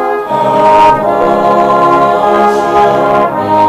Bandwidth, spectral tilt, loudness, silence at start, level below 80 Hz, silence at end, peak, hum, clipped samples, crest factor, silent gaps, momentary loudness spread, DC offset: 15 kHz; -6 dB/octave; -8 LUFS; 0 s; -40 dBFS; 0 s; 0 dBFS; none; under 0.1%; 8 dB; none; 5 LU; under 0.1%